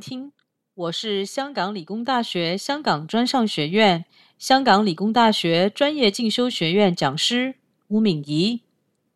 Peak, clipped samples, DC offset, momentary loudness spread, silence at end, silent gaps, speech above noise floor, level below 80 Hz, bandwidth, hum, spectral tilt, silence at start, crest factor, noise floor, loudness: -2 dBFS; under 0.1%; under 0.1%; 10 LU; 0.55 s; none; 49 dB; -68 dBFS; 13 kHz; none; -4.5 dB/octave; 0 s; 18 dB; -70 dBFS; -21 LUFS